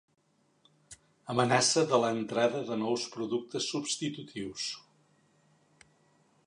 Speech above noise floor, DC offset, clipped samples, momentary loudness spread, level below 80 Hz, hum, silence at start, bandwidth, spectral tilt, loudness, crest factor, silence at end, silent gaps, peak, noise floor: 38 dB; under 0.1%; under 0.1%; 13 LU; -74 dBFS; none; 0.9 s; 11.5 kHz; -3.5 dB/octave; -30 LUFS; 22 dB; 1.65 s; none; -10 dBFS; -69 dBFS